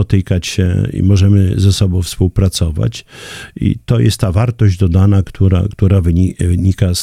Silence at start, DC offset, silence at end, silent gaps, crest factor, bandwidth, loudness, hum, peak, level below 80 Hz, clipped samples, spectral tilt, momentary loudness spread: 0 s; under 0.1%; 0 s; none; 12 dB; 14.5 kHz; -13 LUFS; none; 0 dBFS; -28 dBFS; under 0.1%; -6.5 dB/octave; 7 LU